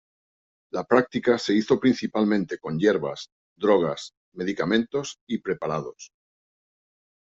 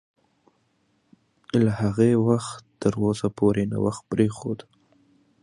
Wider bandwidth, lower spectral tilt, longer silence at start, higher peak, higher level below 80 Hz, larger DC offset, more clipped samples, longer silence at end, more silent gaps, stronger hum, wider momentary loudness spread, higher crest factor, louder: second, 7.8 kHz vs 11 kHz; second, -5.5 dB/octave vs -7.5 dB/octave; second, 0.75 s vs 1.55 s; about the same, -6 dBFS vs -6 dBFS; second, -64 dBFS vs -54 dBFS; neither; neither; first, 1.35 s vs 0.85 s; first, 3.32-3.56 s, 4.17-4.32 s, 5.21-5.27 s vs none; neither; about the same, 12 LU vs 11 LU; about the same, 20 dB vs 18 dB; about the same, -24 LUFS vs -24 LUFS